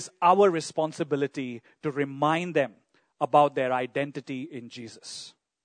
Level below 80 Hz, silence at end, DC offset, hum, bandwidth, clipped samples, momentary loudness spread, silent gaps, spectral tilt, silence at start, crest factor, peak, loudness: -80 dBFS; 0.35 s; under 0.1%; none; 9.6 kHz; under 0.1%; 18 LU; none; -5.5 dB/octave; 0 s; 20 dB; -6 dBFS; -26 LUFS